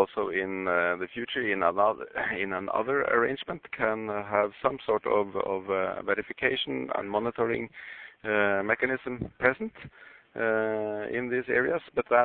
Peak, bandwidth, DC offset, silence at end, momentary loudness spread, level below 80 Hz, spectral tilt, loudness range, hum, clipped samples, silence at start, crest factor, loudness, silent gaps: -6 dBFS; 4.4 kHz; under 0.1%; 0 s; 9 LU; -62 dBFS; -9 dB/octave; 2 LU; none; under 0.1%; 0 s; 22 dB; -28 LUFS; none